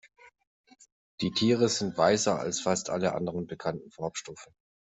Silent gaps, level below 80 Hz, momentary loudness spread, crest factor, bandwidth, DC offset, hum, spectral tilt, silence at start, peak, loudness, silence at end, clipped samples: 0.47-0.64 s, 0.92-1.18 s; -66 dBFS; 12 LU; 20 dB; 8.2 kHz; under 0.1%; none; -4 dB/octave; 0.25 s; -10 dBFS; -29 LUFS; 0.5 s; under 0.1%